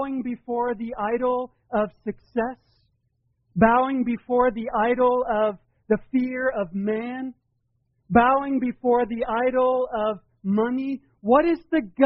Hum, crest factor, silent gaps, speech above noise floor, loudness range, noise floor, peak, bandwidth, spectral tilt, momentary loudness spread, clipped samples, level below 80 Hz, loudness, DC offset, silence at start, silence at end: none; 20 dB; none; 48 dB; 3 LU; -71 dBFS; -4 dBFS; 5.2 kHz; -5.5 dB/octave; 11 LU; under 0.1%; -52 dBFS; -23 LUFS; under 0.1%; 0 s; 0 s